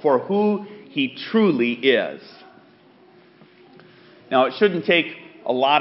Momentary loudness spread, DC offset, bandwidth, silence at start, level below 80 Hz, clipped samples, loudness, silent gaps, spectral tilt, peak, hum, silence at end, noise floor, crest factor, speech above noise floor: 12 LU; under 0.1%; 5.8 kHz; 0.05 s; -76 dBFS; under 0.1%; -21 LUFS; none; -3 dB/octave; -4 dBFS; none; 0 s; -52 dBFS; 18 dB; 32 dB